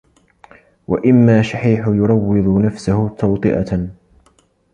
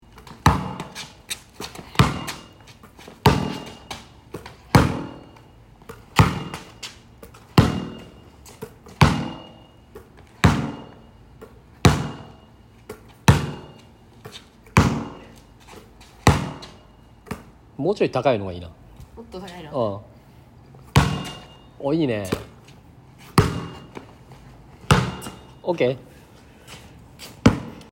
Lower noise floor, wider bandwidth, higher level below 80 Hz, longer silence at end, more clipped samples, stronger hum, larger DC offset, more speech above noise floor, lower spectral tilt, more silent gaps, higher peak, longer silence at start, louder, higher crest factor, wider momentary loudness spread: first, -56 dBFS vs -49 dBFS; second, 9.8 kHz vs 16.5 kHz; about the same, -40 dBFS vs -40 dBFS; first, 0.8 s vs 0.1 s; neither; neither; neither; first, 42 dB vs 26 dB; first, -8.5 dB/octave vs -6 dB/octave; neither; about the same, -2 dBFS vs 0 dBFS; first, 0.9 s vs 0.2 s; first, -15 LUFS vs -22 LUFS; second, 14 dB vs 24 dB; second, 10 LU vs 24 LU